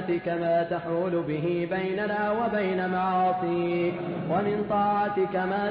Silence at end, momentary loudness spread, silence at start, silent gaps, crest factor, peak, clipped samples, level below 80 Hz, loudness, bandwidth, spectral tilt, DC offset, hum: 0 s; 3 LU; 0 s; none; 12 dB; -14 dBFS; under 0.1%; -60 dBFS; -27 LUFS; 5.2 kHz; -11 dB/octave; under 0.1%; none